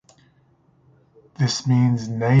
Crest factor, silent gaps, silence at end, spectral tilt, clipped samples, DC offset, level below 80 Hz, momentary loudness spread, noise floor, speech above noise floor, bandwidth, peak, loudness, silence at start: 16 dB; none; 0 s; -6 dB/octave; under 0.1%; under 0.1%; -58 dBFS; 5 LU; -59 dBFS; 41 dB; 7.6 kHz; -6 dBFS; -21 LUFS; 1.4 s